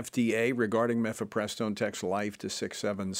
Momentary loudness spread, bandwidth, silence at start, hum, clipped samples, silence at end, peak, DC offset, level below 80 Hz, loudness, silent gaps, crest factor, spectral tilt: 6 LU; 16 kHz; 0 s; none; under 0.1%; 0 s; -14 dBFS; under 0.1%; -70 dBFS; -31 LUFS; none; 16 dB; -4.5 dB/octave